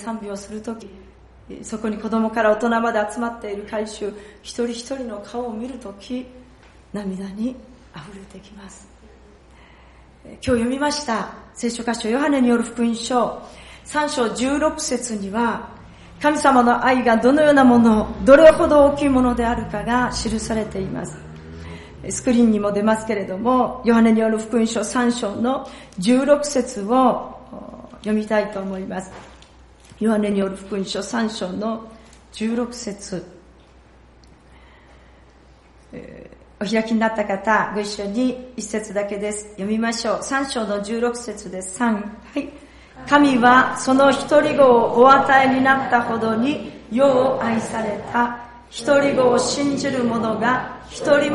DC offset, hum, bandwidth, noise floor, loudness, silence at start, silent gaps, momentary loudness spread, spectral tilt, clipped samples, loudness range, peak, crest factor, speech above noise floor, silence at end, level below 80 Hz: under 0.1%; none; 11.5 kHz; -49 dBFS; -19 LUFS; 0 s; none; 18 LU; -4.5 dB/octave; under 0.1%; 15 LU; 0 dBFS; 20 dB; 30 dB; 0 s; -46 dBFS